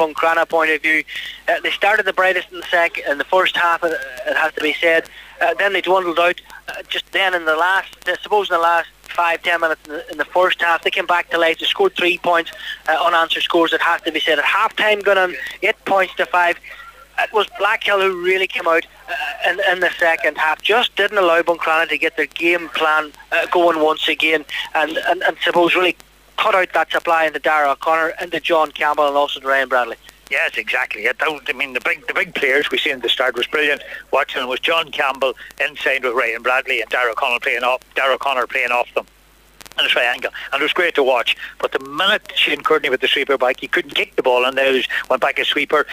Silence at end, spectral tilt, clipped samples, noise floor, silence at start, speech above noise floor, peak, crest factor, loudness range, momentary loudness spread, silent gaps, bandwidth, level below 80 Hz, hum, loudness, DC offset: 0 s; -2.5 dB/octave; under 0.1%; -46 dBFS; 0 s; 29 dB; -4 dBFS; 14 dB; 2 LU; 7 LU; none; 16 kHz; -56 dBFS; none; -17 LUFS; under 0.1%